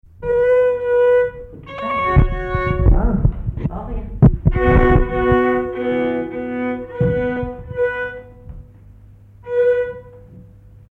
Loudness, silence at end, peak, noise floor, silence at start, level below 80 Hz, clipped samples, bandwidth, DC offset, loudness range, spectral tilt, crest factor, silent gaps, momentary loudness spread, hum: -18 LUFS; 0.5 s; 0 dBFS; -43 dBFS; 0.2 s; -24 dBFS; under 0.1%; 4.1 kHz; under 0.1%; 7 LU; -10 dB/octave; 18 dB; none; 13 LU; none